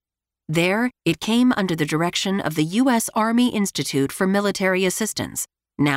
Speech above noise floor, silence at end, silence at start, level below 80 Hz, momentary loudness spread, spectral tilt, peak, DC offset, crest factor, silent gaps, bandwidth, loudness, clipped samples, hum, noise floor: 23 dB; 0 s; 0.5 s; -56 dBFS; 6 LU; -4.5 dB/octave; -6 dBFS; under 0.1%; 14 dB; none; 16 kHz; -21 LUFS; under 0.1%; none; -43 dBFS